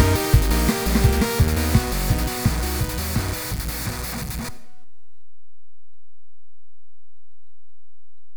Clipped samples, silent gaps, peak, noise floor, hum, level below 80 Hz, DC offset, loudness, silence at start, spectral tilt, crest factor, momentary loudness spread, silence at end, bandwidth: under 0.1%; none; -2 dBFS; -90 dBFS; none; -28 dBFS; under 0.1%; -22 LUFS; 0 s; -5 dB/octave; 20 dB; 9 LU; 0 s; over 20 kHz